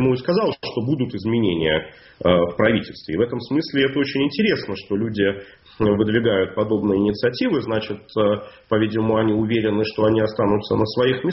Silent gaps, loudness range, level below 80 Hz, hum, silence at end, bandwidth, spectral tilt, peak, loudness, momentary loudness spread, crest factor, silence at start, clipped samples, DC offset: none; 1 LU; -48 dBFS; none; 0 s; 6 kHz; -5 dB/octave; -2 dBFS; -21 LUFS; 6 LU; 18 dB; 0 s; under 0.1%; under 0.1%